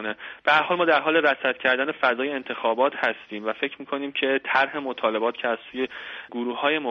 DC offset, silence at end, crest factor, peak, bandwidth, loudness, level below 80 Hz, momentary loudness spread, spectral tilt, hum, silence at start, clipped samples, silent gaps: under 0.1%; 0 s; 18 dB; -6 dBFS; 7.2 kHz; -24 LUFS; -70 dBFS; 11 LU; -5.5 dB/octave; none; 0 s; under 0.1%; none